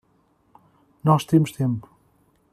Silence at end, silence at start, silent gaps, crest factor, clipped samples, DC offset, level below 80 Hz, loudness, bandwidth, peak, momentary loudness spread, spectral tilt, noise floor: 0.7 s; 1.05 s; none; 20 dB; under 0.1%; under 0.1%; -60 dBFS; -22 LUFS; 14 kHz; -4 dBFS; 8 LU; -7.5 dB/octave; -63 dBFS